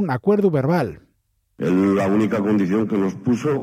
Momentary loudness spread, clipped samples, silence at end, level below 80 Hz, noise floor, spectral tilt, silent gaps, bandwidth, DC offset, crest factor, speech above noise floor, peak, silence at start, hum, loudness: 4 LU; under 0.1%; 0 s; -58 dBFS; -67 dBFS; -8 dB/octave; none; 15 kHz; under 0.1%; 12 dB; 48 dB; -6 dBFS; 0 s; none; -20 LUFS